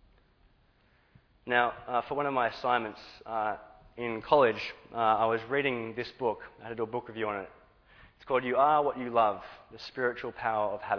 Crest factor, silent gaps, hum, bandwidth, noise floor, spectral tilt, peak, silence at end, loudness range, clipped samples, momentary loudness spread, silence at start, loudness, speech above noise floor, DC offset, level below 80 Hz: 22 dB; none; none; 5.4 kHz; -66 dBFS; -6.5 dB/octave; -8 dBFS; 0 s; 3 LU; under 0.1%; 16 LU; 1.45 s; -30 LUFS; 36 dB; under 0.1%; -64 dBFS